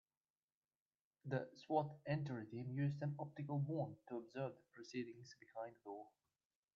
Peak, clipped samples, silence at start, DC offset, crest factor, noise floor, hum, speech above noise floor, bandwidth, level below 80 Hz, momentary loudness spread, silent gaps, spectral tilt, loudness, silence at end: -26 dBFS; under 0.1%; 1.25 s; under 0.1%; 22 dB; under -90 dBFS; none; over 44 dB; 7.2 kHz; -86 dBFS; 14 LU; none; -7.5 dB/octave; -46 LUFS; 0.7 s